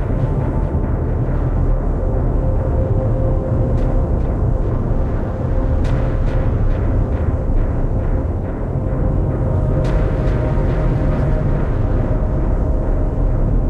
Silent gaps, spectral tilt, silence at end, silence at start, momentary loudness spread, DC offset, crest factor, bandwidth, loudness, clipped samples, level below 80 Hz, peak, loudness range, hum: none; -10 dB/octave; 0 s; 0 s; 2 LU; under 0.1%; 10 dB; 4.3 kHz; -19 LUFS; under 0.1%; -18 dBFS; -4 dBFS; 1 LU; none